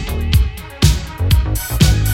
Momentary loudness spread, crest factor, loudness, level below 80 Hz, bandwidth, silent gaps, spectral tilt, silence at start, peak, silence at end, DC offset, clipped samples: 6 LU; 14 dB; -16 LUFS; -18 dBFS; 17 kHz; none; -5 dB/octave; 0 s; 0 dBFS; 0 s; under 0.1%; under 0.1%